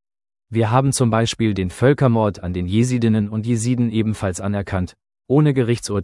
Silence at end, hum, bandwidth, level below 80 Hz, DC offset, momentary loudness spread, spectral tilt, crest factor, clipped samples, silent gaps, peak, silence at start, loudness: 0 s; none; 12 kHz; -48 dBFS; under 0.1%; 8 LU; -6.5 dB/octave; 18 dB; under 0.1%; none; -2 dBFS; 0.5 s; -19 LUFS